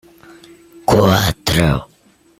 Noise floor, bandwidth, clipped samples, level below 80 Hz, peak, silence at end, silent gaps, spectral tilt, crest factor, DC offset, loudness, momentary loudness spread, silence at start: -52 dBFS; 16.5 kHz; under 0.1%; -34 dBFS; -2 dBFS; 0.55 s; none; -5 dB/octave; 16 dB; under 0.1%; -15 LUFS; 10 LU; 0.9 s